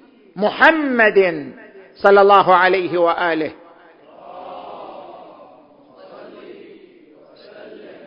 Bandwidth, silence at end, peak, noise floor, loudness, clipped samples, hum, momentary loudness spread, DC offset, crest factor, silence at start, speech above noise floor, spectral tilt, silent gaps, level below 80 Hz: 5.6 kHz; 0.3 s; 0 dBFS; -47 dBFS; -14 LUFS; under 0.1%; none; 25 LU; under 0.1%; 18 dB; 0.35 s; 33 dB; -6.5 dB/octave; none; -62 dBFS